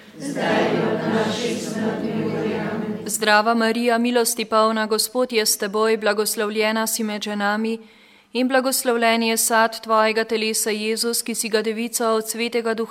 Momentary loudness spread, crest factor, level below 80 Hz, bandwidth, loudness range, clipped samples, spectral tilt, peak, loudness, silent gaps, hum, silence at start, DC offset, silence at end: 7 LU; 20 dB; -66 dBFS; 16.5 kHz; 2 LU; under 0.1%; -3 dB/octave; -2 dBFS; -20 LUFS; none; none; 0 s; under 0.1%; 0 s